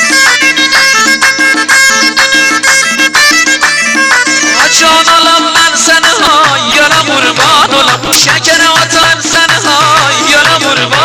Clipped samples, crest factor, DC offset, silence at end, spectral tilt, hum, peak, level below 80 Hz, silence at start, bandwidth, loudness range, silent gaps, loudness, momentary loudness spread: 0.3%; 6 dB; 0.1%; 0 s; -0.5 dB/octave; none; 0 dBFS; -42 dBFS; 0 s; over 20 kHz; 1 LU; none; -5 LUFS; 2 LU